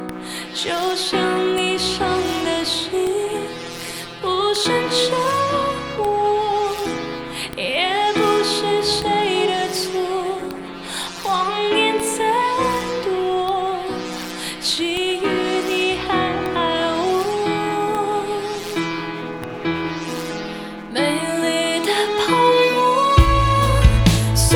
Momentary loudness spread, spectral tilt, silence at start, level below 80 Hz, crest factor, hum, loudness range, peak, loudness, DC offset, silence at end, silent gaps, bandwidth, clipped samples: 11 LU; -4.5 dB/octave; 0 s; -30 dBFS; 18 dB; none; 5 LU; 0 dBFS; -20 LUFS; under 0.1%; 0 s; none; over 20 kHz; under 0.1%